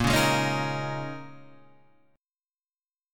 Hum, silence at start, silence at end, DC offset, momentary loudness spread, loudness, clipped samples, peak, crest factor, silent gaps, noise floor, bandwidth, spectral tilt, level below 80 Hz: none; 0 s; 0 s; under 0.1%; 19 LU; -27 LUFS; under 0.1%; -10 dBFS; 20 dB; 2.85-2.89 s; under -90 dBFS; 17.5 kHz; -4.5 dB/octave; -48 dBFS